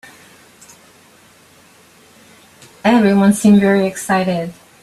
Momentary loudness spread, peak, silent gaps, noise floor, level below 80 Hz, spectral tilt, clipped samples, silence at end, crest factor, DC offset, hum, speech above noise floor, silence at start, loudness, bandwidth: 10 LU; -2 dBFS; none; -47 dBFS; -56 dBFS; -6 dB/octave; under 0.1%; 0.3 s; 16 dB; under 0.1%; none; 35 dB; 2.85 s; -14 LUFS; 13.5 kHz